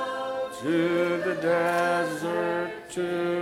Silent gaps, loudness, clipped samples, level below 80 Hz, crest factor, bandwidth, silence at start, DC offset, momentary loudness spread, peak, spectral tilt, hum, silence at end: none; -27 LUFS; under 0.1%; -66 dBFS; 14 dB; 15.5 kHz; 0 s; under 0.1%; 7 LU; -12 dBFS; -5.5 dB/octave; none; 0 s